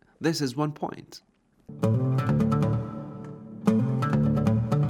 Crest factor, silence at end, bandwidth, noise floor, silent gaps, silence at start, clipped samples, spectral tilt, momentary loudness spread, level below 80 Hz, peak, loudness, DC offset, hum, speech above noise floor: 18 dB; 0 s; 14 kHz; -46 dBFS; none; 0.2 s; under 0.1%; -7.5 dB/octave; 16 LU; -50 dBFS; -8 dBFS; -26 LUFS; under 0.1%; none; 20 dB